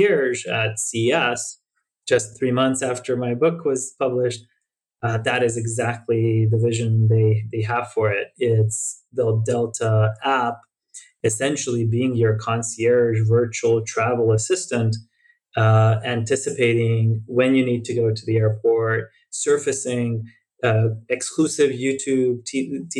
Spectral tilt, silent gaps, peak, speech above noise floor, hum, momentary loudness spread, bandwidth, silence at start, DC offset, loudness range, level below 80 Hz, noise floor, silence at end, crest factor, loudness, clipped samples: -5.5 dB/octave; none; -6 dBFS; 55 dB; none; 7 LU; 11.5 kHz; 0 s; under 0.1%; 3 LU; -62 dBFS; -75 dBFS; 0 s; 16 dB; -21 LUFS; under 0.1%